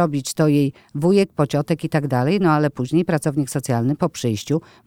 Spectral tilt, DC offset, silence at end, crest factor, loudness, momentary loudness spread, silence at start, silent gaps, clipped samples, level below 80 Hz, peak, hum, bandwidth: -6.5 dB/octave; under 0.1%; 0.25 s; 16 dB; -20 LUFS; 6 LU; 0 s; none; under 0.1%; -56 dBFS; -4 dBFS; none; 16.5 kHz